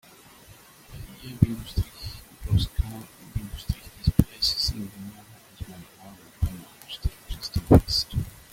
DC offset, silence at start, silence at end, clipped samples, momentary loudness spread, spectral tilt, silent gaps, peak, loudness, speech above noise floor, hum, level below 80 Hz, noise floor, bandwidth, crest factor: under 0.1%; 0.9 s; 0.2 s; under 0.1%; 21 LU; -6 dB/octave; none; -2 dBFS; -26 LUFS; 25 dB; none; -36 dBFS; -51 dBFS; 16.5 kHz; 26 dB